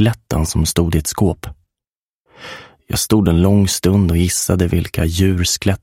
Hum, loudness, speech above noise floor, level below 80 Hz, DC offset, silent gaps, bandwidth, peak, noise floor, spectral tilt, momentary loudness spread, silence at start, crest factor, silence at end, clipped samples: none; -16 LUFS; over 75 dB; -30 dBFS; under 0.1%; 1.87-1.91 s, 1.98-2.25 s; 16.5 kHz; 0 dBFS; under -90 dBFS; -5 dB/octave; 20 LU; 0 s; 16 dB; 0.05 s; under 0.1%